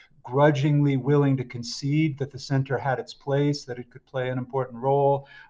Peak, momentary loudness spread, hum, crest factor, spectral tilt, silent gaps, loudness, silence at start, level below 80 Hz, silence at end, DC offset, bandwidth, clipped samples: -6 dBFS; 11 LU; none; 18 dB; -7 dB/octave; none; -25 LUFS; 0.25 s; -60 dBFS; 0.05 s; under 0.1%; 7.6 kHz; under 0.1%